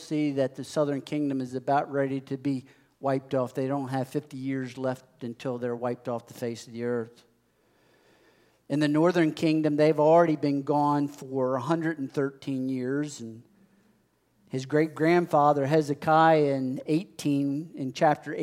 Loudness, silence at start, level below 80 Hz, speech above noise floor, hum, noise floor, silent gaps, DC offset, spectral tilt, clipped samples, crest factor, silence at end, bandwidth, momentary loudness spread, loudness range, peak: -27 LUFS; 0 s; -78 dBFS; 41 dB; none; -68 dBFS; none; under 0.1%; -7 dB/octave; under 0.1%; 20 dB; 0 s; 15 kHz; 13 LU; 9 LU; -8 dBFS